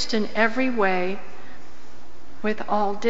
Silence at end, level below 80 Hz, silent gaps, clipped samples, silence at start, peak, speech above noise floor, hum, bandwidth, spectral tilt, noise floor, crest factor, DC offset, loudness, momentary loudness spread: 0 s; -54 dBFS; none; under 0.1%; 0 s; -6 dBFS; 25 dB; none; 8 kHz; -3 dB/octave; -48 dBFS; 22 dB; 7%; -24 LUFS; 16 LU